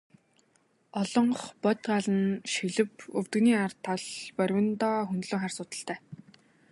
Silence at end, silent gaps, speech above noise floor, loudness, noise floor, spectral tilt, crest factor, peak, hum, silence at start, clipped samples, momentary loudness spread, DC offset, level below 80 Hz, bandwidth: 0.55 s; none; 40 dB; -29 LUFS; -69 dBFS; -5 dB/octave; 18 dB; -10 dBFS; none; 0.95 s; under 0.1%; 11 LU; under 0.1%; -74 dBFS; 11.5 kHz